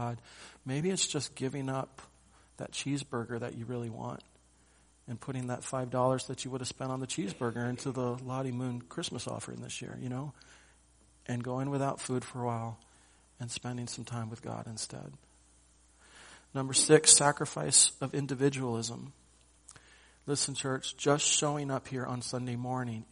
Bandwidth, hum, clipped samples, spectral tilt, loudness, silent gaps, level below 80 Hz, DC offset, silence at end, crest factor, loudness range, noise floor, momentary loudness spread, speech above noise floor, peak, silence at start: 10.5 kHz; none; under 0.1%; -3.5 dB/octave; -31 LUFS; none; -66 dBFS; under 0.1%; 0.05 s; 28 dB; 14 LU; -64 dBFS; 17 LU; 31 dB; -6 dBFS; 0 s